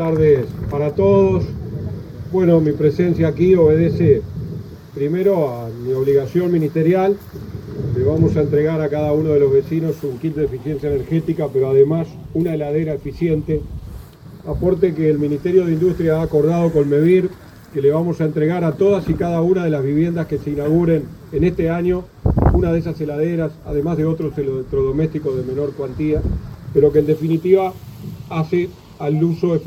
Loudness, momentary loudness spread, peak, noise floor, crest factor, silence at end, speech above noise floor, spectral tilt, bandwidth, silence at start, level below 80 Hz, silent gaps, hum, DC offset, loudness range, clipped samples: -18 LUFS; 12 LU; 0 dBFS; -37 dBFS; 16 dB; 0 s; 20 dB; -9.5 dB/octave; 15 kHz; 0 s; -34 dBFS; none; none; under 0.1%; 3 LU; under 0.1%